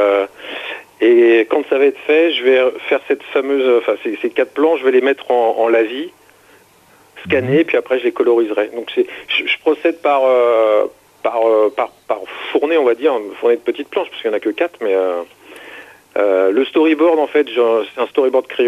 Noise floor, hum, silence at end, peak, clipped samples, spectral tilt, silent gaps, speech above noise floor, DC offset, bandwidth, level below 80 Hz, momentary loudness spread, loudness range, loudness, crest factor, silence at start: -49 dBFS; none; 0 s; -2 dBFS; under 0.1%; -6 dB/octave; none; 34 dB; under 0.1%; 13 kHz; -64 dBFS; 11 LU; 4 LU; -15 LUFS; 12 dB; 0 s